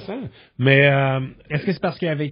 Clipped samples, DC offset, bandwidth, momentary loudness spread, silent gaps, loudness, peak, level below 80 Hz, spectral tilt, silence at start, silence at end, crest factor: under 0.1%; under 0.1%; 5.4 kHz; 18 LU; none; -19 LUFS; 0 dBFS; -56 dBFS; -5 dB/octave; 0 s; 0 s; 20 dB